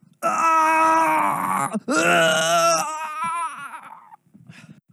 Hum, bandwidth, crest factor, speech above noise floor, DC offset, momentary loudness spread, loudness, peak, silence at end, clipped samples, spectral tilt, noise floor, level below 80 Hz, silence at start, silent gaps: none; 15.5 kHz; 16 dB; 30 dB; under 0.1%; 12 LU; -19 LUFS; -6 dBFS; 0.2 s; under 0.1%; -2.5 dB/octave; -49 dBFS; -84 dBFS; 0.2 s; none